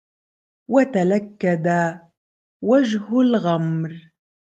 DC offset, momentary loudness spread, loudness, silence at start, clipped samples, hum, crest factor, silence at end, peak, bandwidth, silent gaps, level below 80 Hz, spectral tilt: under 0.1%; 8 LU; -20 LUFS; 0.7 s; under 0.1%; none; 18 dB; 0.45 s; -4 dBFS; 8 kHz; 2.17-2.60 s; -68 dBFS; -7.5 dB/octave